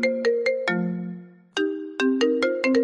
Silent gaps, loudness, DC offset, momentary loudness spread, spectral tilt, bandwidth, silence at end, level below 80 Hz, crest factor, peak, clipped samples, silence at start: none; -24 LUFS; under 0.1%; 11 LU; -5.5 dB/octave; 10.5 kHz; 0 s; -72 dBFS; 14 dB; -10 dBFS; under 0.1%; 0 s